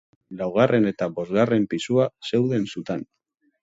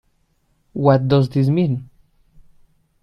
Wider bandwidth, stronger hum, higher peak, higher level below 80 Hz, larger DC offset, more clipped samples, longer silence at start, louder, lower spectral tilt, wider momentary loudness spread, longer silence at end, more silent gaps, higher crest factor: first, 8 kHz vs 5.8 kHz; neither; second, -4 dBFS vs 0 dBFS; second, -62 dBFS vs -52 dBFS; neither; neither; second, 0.3 s vs 0.75 s; second, -23 LUFS vs -18 LUFS; second, -7 dB/octave vs -9.5 dB/octave; about the same, 12 LU vs 11 LU; second, 0.6 s vs 1.15 s; neither; about the same, 20 dB vs 20 dB